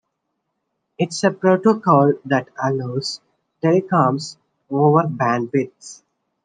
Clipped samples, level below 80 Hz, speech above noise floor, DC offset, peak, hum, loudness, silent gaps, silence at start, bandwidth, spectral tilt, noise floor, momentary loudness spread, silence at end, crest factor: under 0.1%; -70 dBFS; 57 dB; under 0.1%; -2 dBFS; none; -19 LUFS; none; 1 s; 9.6 kHz; -6.5 dB/octave; -75 dBFS; 13 LU; 0.5 s; 18 dB